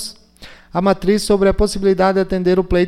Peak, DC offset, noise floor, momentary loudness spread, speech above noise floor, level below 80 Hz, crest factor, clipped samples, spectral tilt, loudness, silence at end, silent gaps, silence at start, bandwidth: -4 dBFS; under 0.1%; -41 dBFS; 5 LU; 26 dB; -30 dBFS; 12 dB; under 0.1%; -6 dB/octave; -16 LUFS; 0 s; none; 0 s; 15 kHz